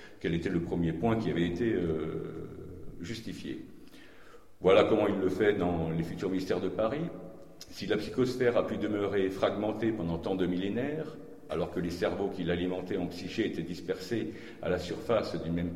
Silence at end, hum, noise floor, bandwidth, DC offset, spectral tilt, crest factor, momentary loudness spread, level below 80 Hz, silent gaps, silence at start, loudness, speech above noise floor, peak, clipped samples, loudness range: 0 s; none; -55 dBFS; 15 kHz; 0.2%; -7 dB/octave; 20 dB; 14 LU; -54 dBFS; none; 0 s; -31 LUFS; 24 dB; -10 dBFS; under 0.1%; 5 LU